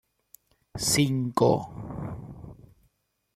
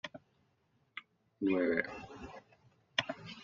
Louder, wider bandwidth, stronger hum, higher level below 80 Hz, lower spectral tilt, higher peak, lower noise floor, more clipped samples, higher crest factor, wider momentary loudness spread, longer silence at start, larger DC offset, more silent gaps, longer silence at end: first, -26 LUFS vs -36 LUFS; first, 15.5 kHz vs 7.4 kHz; neither; first, -54 dBFS vs -70 dBFS; first, -4.5 dB/octave vs -2.5 dB/octave; first, -8 dBFS vs -12 dBFS; about the same, -72 dBFS vs -75 dBFS; neither; second, 20 dB vs 26 dB; about the same, 21 LU vs 19 LU; first, 0.75 s vs 0.05 s; neither; neither; first, 0.8 s vs 0 s